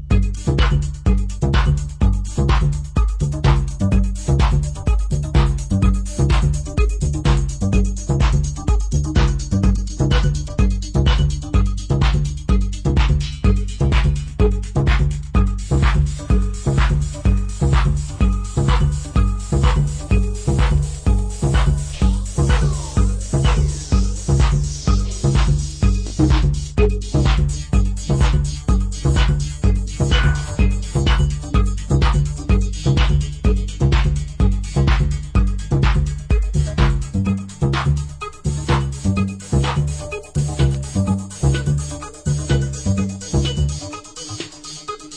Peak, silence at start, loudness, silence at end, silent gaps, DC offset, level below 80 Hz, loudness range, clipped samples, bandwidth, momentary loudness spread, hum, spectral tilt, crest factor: -4 dBFS; 0 s; -19 LUFS; 0 s; none; under 0.1%; -20 dBFS; 2 LU; under 0.1%; 10 kHz; 4 LU; none; -6 dB/octave; 14 dB